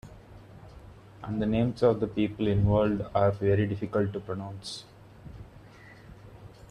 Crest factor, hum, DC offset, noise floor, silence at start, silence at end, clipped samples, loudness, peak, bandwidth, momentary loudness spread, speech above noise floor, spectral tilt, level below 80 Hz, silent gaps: 18 dB; none; under 0.1%; -50 dBFS; 0.05 s; 0.2 s; under 0.1%; -28 LUFS; -10 dBFS; 10.5 kHz; 25 LU; 24 dB; -8 dB/octave; -50 dBFS; none